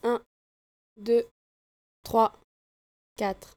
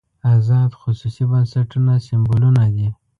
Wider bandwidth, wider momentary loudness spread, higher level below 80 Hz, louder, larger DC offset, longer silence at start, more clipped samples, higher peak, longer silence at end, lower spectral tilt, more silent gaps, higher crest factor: first, 17.5 kHz vs 5 kHz; first, 15 LU vs 7 LU; second, -62 dBFS vs -44 dBFS; second, -28 LUFS vs -17 LUFS; neither; second, 0.05 s vs 0.25 s; neither; second, -10 dBFS vs -4 dBFS; about the same, 0.2 s vs 0.25 s; second, -5.5 dB/octave vs -9.5 dB/octave; first, 0.26-0.96 s, 1.31-2.03 s, 2.44-3.16 s vs none; first, 22 dB vs 12 dB